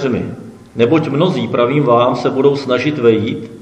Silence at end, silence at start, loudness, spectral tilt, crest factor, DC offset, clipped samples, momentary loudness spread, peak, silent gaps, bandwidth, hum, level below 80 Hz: 0 s; 0 s; -14 LUFS; -7.5 dB/octave; 14 dB; under 0.1%; under 0.1%; 10 LU; 0 dBFS; none; 12 kHz; none; -56 dBFS